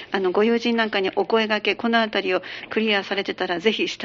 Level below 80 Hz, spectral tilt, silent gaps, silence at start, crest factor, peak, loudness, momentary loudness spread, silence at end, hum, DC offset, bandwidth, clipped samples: -66 dBFS; -1.5 dB/octave; none; 0 s; 18 dB; -4 dBFS; -22 LUFS; 5 LU; 0 s; none; under 0.1%; 7.4 kHz; under 0.1%